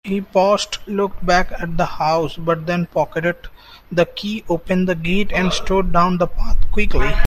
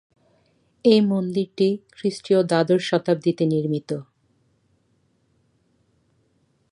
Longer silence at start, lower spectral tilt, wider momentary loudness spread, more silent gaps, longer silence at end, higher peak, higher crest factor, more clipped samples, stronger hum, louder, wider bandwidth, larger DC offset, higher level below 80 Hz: second, 0.05 s vs 0.85 s; second, -5.5 dB/octave vs -7 dB/octave; second, 7 LU vs 10 LU; neither; second, 0 s vs 2.7 s; first, 0 dBFS vs -4 dBFS; about the same, 16 dB vs 20 dB; neither; neither; first, -19 LUFS vs -22 LUFS; first, 12.5 kHz vs 11 kHz; neither; first, -24 dBFS vs -70 dBFS